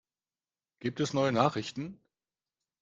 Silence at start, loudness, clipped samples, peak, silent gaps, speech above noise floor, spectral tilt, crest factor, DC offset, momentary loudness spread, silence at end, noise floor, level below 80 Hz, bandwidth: 0.8 s; -31 LUFS; under 0.1%; -10 dBFS; none; over 60 dB; -5.5 dB/octave; 24 dB; under 0.1%; 14 LU; 0.85 s; under -90 dBFS; -70 dBFS; 9.4 kHz